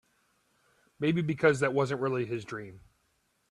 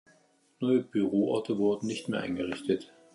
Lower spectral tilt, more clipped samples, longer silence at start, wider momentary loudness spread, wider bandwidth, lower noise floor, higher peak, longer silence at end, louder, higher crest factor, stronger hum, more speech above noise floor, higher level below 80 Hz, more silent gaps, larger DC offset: about the same, -6.5 dB/octave vs -6.5 dB/octave; neither; first, 1 s vs 0.6 s; first, 16 LU vs 6 LU; about the same, 12 kHz vs 11.5 kHz; first, -74 dBFS vs -65 dBFS; first, -10 dBFS vs -14 dBFS; first, 0.7 s vs 0.3 s; about the same, -29 LUFS vs -30 LUFS; first, 22 dB vs 16 dB; neither; first, 45 dB vs 36 dB; about the same, -68 dBFS vs -66 dBFS; neither; neither